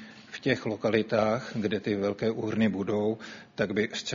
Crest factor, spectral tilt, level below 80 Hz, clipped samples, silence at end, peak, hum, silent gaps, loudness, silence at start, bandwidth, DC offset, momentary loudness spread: 18 dB; -4.5 dB/octave; -64 dBFS; under 0.1%; 0 s; -10 dBFS; none; none; -29 LUFS; 0 s; 7.2 kHz; under 0.1%; 6 LU